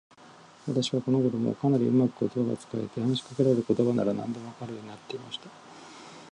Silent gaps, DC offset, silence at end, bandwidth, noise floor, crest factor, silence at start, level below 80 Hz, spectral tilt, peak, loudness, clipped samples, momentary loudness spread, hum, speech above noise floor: none; under 0.1%; 0.05 s; 10.5 kHz; -52 dBFS; 18 dB; 0.25 s; -68 dBFS; -7 dB/octave; -10 dBFS; -28 LUFS; under 0.1%; 19 LU; none; 25 dB